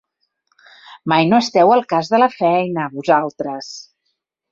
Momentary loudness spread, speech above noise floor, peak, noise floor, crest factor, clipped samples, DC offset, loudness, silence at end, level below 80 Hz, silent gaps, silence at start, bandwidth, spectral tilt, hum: 16 LU; 57 dB; -2 dBFS; -73 dBFS; 16 dB; under 0.1%; under 0.1%; -16 LUFS; 0.7 s; -64 dBFS; none; 0.9 s; 7.8 kHz; -5.5 dB/octave; none